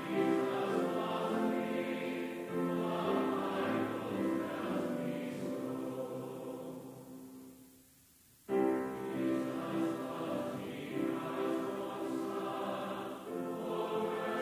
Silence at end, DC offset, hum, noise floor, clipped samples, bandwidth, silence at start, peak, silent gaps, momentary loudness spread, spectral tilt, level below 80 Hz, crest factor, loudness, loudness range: 0 s; under 0.1%; none; -64 dBFS; under 0.1%; 16 kHz; 0 s; -22 dBFS; none; 10 LU; -6.5 dB/octave; -74 dBFS; 16 dB; -37 LUFS; 5 LU